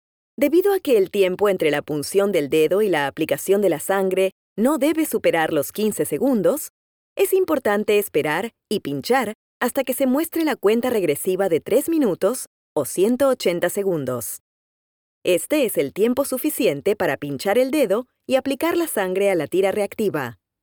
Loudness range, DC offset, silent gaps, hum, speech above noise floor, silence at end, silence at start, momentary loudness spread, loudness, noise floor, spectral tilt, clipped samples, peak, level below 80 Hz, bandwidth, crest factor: 3 LU; under 0.1%; 4.32-4.56 s, 6.70-7.16 s, 9.35-9.61 s, 12.47-12.76 s, 14.40-15.21 s; none; over 70 dB; 0.3 s; 0.4 s; 6 LU; -21 LUFS; under -90 dBFS; -4.5 dB/octave; under 0.1%; -6 dBFS; -64 dBFS; over 20 kHz; 14 dB